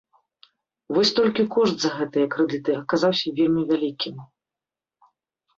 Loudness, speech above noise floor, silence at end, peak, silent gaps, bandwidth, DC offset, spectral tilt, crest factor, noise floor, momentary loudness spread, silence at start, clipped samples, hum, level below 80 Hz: -22 LUFS; 68 dB; 1.35 s; -8 dBFS; none; 7.8 kHz; under 0.1%; -5 dB/octave; 16 dB; -89 dBFS; 7 LU; 0.9 s; under 0.1%; none; -66 dBFS